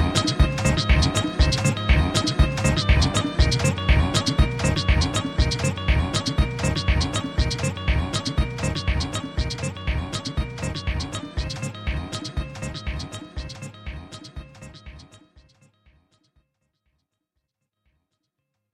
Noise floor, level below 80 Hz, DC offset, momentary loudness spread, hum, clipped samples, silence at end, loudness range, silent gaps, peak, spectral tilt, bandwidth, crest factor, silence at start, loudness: -78 dBFS; -28 dBFS; under 0.1%; 15 LU; none; under 0.1%; 3.6 s; 15 LU; none; -4 dBFS; -5 dB/octave; 12.5 kHz; 20 dB; 0 s; -23 LUFS